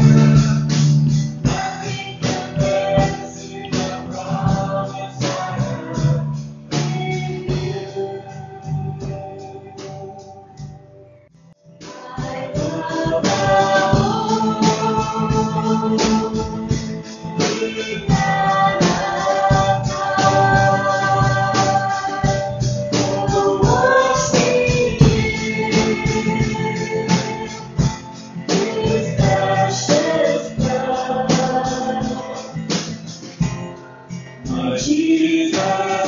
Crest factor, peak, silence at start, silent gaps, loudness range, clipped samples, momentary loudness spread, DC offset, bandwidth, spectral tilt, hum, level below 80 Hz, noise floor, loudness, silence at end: 18 dB; 0 dBFS; 0 s; none; 10 LU; under 0.1%; 15 LU; under 0.1%; 7.6 kHz; -5.5 dB/octave; none; -38 dBFS; -48 dBFS; -18 LUFS; 0 s